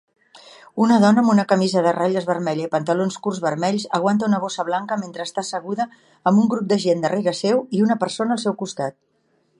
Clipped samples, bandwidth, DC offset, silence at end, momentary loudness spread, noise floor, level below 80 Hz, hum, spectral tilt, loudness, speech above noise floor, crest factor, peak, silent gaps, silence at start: under 0.1%; 10.5 kHz; under 0.1%; 0.7 s; 10 LU; -64 dBFS; -70 dBFS; none; -6 dB/octave; -20 LUFS; 44 dB; 18 dB; -2 dBFS; none; 0.35 s